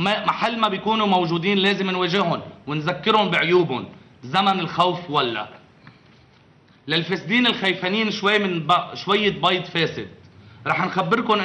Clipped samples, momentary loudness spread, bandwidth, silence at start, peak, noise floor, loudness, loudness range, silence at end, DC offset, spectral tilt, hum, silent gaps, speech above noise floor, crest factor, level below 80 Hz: under 0.1%; 10 LU; 9.6 kHz; 0 s; -6 dBFS; -53 dBFS; -21 LUFS; 3 LU; 0 s; under 0.1%; -5.5 dB/octave; none; none; 32 dB; 16 dB; -62 dBFS